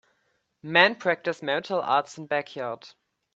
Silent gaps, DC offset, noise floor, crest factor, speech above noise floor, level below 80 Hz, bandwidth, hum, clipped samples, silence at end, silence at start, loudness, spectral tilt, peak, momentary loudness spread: none; under 0.1%; -73 dBFS; 26 dB; 47 dB; -76 dBFS; 8 kHz; none; under 0.1%; 0.45 s; 0.65 s; -25 LUFS; -4 dB/octave; -2 dBFS; 15 LU